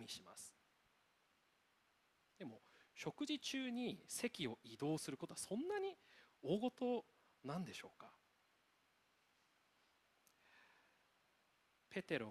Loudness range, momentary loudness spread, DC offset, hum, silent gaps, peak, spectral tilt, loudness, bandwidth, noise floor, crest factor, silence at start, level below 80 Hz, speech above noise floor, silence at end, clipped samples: 11 LU; 16 LU; under 0.1%; none; none; -28 dBFS; -4 dB/octave; -46 LUFS; 14.5 kHz; -79 dBFS; 22 dB; 0 s; -86 dBFS; 34 dB; 0 s; under 0.1%